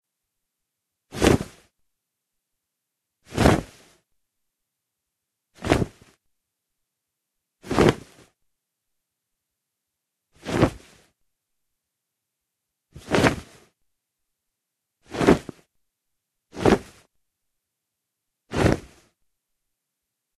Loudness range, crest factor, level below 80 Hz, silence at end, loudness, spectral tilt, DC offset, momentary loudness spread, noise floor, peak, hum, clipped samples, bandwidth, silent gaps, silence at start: 6 LU; 28 dB; -42 dBFS; 1.6 s; -23 LUFS; -6 dB/octave; under 0.1%; 17 LU; -83 dBFS; 0 dBFS; none; under 0.1%; 13 kHz; none; 1.15 s